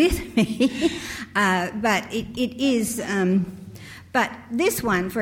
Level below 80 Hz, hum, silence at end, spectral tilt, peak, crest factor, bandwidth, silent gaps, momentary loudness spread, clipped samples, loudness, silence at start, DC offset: -42 dBFS; none; 0 s; -4.5 dB/octave; -6 dBFS; 16 dB; 17.5 kHz; none; 9 LU; under 0.1%; -23 LUFS; 0 s; under 0.1%